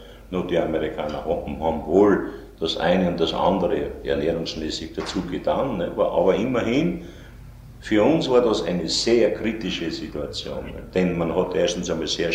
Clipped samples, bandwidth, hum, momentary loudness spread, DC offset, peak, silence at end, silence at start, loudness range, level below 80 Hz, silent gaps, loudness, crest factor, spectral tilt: under 0.1%; 15.5 kHz; none; 11 LU; under 0.1%; -4 dBFS; 0 s; 0 s; 2 LU; -42 dBFS; none; -23 LUFS; 18 dB; -5.5 dB/octave